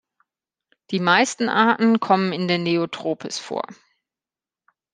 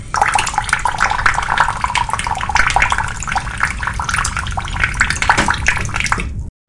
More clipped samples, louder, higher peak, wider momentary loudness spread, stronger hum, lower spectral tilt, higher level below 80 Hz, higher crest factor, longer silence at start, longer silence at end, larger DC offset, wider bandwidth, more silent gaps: neither; second, -20 LUFS vs -16 LUFS; about the same, -2 dBFS vs 0 dBFS; first, 11 LU vs 7 LU; neither; first, -4.5 dB/octave vs -2.5 dB/octave; second, -72 dBFS vs -26 dBFS; first, 22 dB vs 16 dB; first, 0.9 s vs 0 s; first, 1.2 s vs 0.2 s; neither; second, 9.8 kHz vs 11.5 kHz; neither